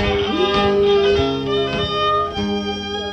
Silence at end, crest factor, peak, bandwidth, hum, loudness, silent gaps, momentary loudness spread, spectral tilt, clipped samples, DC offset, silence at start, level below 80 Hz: 0 s; 14 dB; -6 dBFS; 8.2 kHz; none; -18 LUFS; none; 7 LU; -5.5 dB/octave; under 0.1%; under 0.1%; 0 s; -36 dBFS